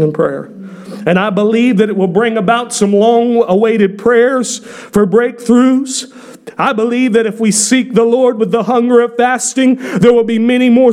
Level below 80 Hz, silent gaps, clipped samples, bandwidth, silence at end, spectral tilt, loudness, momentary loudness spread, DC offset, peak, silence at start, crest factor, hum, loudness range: -52 dBFS; none; under 0.1%; 14 kHz; 0 s; -5 dB/octave; -11 LUFS; 9 LU; under 0.1%; 0 dBFS; 0 s; 10 dB; none; 2 LU